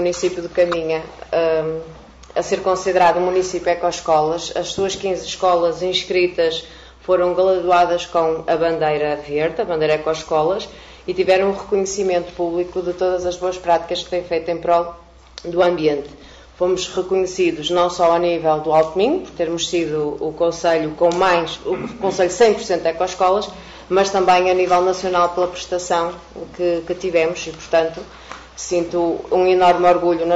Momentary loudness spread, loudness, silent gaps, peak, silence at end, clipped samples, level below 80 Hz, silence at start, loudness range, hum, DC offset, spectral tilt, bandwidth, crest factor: 10 LU; -18 LUFS; none; -2 dBFS; 0 s; under 0.1%; -48 dBFS; 0 s; 3 LU; none; under 0.1%; -4 dB/octave; 8 kHz; 16 dB